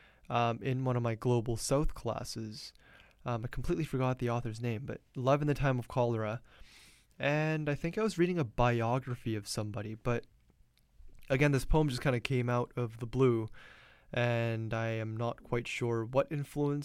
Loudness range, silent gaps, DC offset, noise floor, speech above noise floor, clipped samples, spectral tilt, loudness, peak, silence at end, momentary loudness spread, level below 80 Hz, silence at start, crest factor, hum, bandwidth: 3 LU; none; under 0.1%; -66 dBFS; 34 dB; under 0.1%; -6.5 dB/octave; -33 LUFS; -14 dBFS; 0 s; 9 LU; -48 dBFS; 0.3 s; 20 dB; none; 14.5 kHz